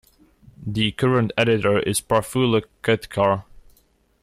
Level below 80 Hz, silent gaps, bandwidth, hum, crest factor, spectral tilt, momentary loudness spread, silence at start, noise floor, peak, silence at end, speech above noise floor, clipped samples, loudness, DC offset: -50 dBFS; none; 15.5 kHz; none; 16 dB; -5 dB/octave; 4 LU; 0.6 s; -60 dBFS; -6 dBFS; 0.65 s; 40 dB; under 0.1%; -21 LUFS; under 0.1%